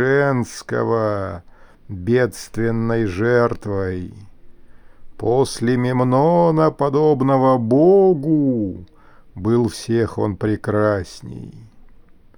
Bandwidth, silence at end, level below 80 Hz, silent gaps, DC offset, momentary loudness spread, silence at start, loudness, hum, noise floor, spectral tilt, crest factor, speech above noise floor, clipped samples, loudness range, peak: over 20 kHz; 0.55 s; -46 dBFS; none; under 0.1%; 15 LU; 0 s; -18 LUFS; none; -45 dBFS; -7.5 dB/octave; 16 dB; 27 dB; under 0.1%; 6 LU; -4 dBFS